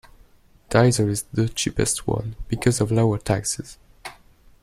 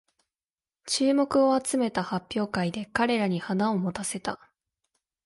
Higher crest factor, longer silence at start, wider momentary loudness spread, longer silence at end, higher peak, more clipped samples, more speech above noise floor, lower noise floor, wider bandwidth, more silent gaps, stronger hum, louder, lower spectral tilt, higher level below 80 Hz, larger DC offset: about the same, 20 dB vs 18 dB; second, 0.7 s vs 0.85 s; first, 21 LU vs 9 LU; second, 0.5 s vs 0.9 s; first, -4 dBFS vs -10 dBFS; neither; second, 32 dB vs over 64 dB; second, -53 dBFS vs under -90 dBFS; first, 15 kHz vs 11.5 kHz; neither; neither; first, -22 LUFS vs -27 LUFS; about the same, -5 dB/octave vs -4.5 dB/octave; first, -42 dBFS vs -62 dBFS; neither